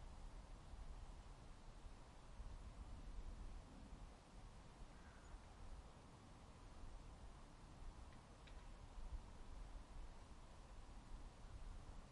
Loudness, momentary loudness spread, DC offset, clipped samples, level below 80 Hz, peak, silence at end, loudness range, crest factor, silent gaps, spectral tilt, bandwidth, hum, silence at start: -62 LUFS; 5 LU; under 0.1%; under 0.1%; -58 dBFS; -40 dBFS; 0 s; 2 LU; 16 dB; none; -5.5 dB/octave; 11 kHz; none; 0 s